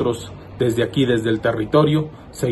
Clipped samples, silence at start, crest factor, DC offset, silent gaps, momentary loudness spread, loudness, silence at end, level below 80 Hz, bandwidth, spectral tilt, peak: under 0.1%; 0 s; 16 dB; under 0.1%; none; 13 LU; -19 LUFS; 0 s; -46 dBFS; 12.5 kHz; -6.5 dB/octave; -2 dBFS